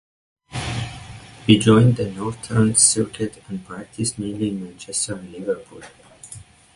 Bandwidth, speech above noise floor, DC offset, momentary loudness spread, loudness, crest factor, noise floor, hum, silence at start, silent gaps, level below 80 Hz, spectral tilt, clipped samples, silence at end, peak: 11.5 kHz; 23 dB; under 0.1%; 22 LU; -20 LUFS; 20 dB; -43 dBFS; none; 0.5 s; none; -48 dBFS; -4.5 dB/octave; under 0.1%; 0.35 s; -2 dBFS